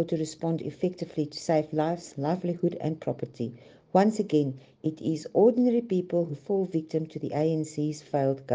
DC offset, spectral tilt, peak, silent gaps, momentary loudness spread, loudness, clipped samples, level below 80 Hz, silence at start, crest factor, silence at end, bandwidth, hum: under 0.1%; -7.5 dB/octave; -8 dBFS; none; 9 LU; -28 LUFS; under 0.1%; -70 dBFS; 0 s; 20 dB; 0 s; 9.6 kHz; none